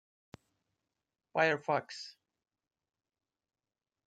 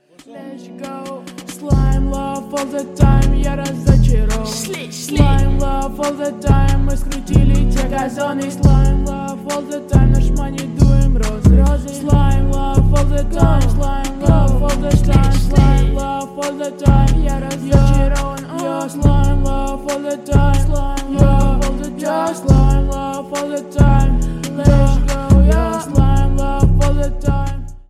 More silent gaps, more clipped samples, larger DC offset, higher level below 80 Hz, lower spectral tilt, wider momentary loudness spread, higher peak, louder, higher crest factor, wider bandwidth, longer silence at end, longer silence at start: neither; neither; neither; second, -84 dBFS vs -16 dBFS; second, -4.5 dB/octave vs -7 dB/octave; first, 16 LU vs 10 LU; second, -16 dBFS vs -2 dBFS; second, -33 LUFS vs -16 LUFS; first, 24 dB vs 12 dB; second, 9.2 kHz vs 14 kHz; first, 2 s vs 0.1 s; first, 1.35 s vs 0.3 s